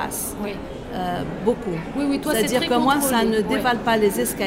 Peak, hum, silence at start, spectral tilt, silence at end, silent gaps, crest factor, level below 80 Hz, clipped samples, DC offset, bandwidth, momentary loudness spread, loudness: -6 dBFS; none; 0 s; -4 dB/octave; 0 s; none; 16 dB; -44 dBFS; under 0.1%; under 0.1%; 16.5 kHz; 10 LU; -22 LUFS